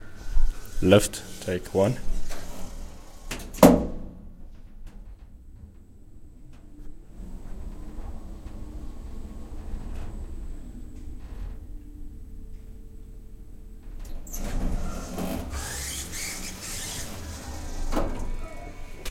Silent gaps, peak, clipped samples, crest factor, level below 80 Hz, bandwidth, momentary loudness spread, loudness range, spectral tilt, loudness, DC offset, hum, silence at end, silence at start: none; 0 dBFS; under 0.1%; 28 dB; -34 dBFS; 16.5 kHz; 24 LU; 20 LU; -5 dB/octave; -28 LUFS; under 0.1%; none; 0 s; 0 s